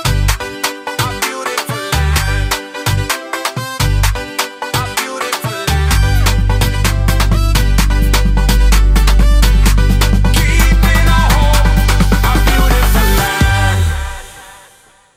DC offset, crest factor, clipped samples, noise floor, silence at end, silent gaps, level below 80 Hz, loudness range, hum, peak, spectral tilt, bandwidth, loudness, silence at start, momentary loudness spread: under 0.1%; 10 dB; under 0.1%; -46 dBFS; 0.6 s; none; -14 dBFS; 5 LU; none; 0 dBFS; -4.5 dB/octave; 16 kHz; -13 LUFS; 0 s; 7 LU